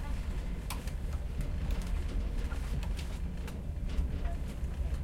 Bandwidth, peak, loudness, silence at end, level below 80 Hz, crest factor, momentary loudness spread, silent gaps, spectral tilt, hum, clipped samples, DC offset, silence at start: 16 kHz; -20 dBFS; -38 LUFS; 0 s; -36 dBFS; 14 dB; 3 LU; none; -6 dB/octave; none; under 0.1%; under 0.1%; 0 s